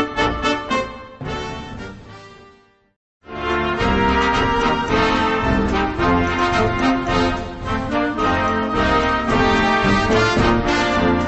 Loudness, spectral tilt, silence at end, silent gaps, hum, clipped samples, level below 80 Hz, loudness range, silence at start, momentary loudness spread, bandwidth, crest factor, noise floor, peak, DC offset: -18 LUFS; -5.5 dB/octave; 0 s; 2.96-3.20 s; none; under 0.1%; -32 dBFS; 8 LU; 0 s; 12 LU; 8.4 kHz; 16 dB; -51 dBFS; -2 dBFS; under 0.1%